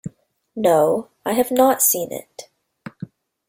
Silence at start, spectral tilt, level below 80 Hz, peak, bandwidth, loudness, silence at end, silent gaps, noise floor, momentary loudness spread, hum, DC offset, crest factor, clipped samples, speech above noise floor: 0.05 s; -4 dB/octave; -62 dBFS; -2 dBFS; 17 kHz; -18 LUFS; 0.45 s; none; -47 dBFS; 23 LU; none; under 0.1%; 20 dB; under 0.1%; 28 dB